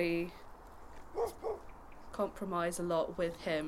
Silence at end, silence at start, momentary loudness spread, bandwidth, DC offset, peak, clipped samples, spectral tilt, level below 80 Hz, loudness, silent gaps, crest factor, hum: 0 s; 0 s; 20 LU; 16 kHz; under 0.1%; -20 dBFS; under 0.1%; -5 dB/octave; -56 dBFS; -38 LUFS; none; 18 dB; none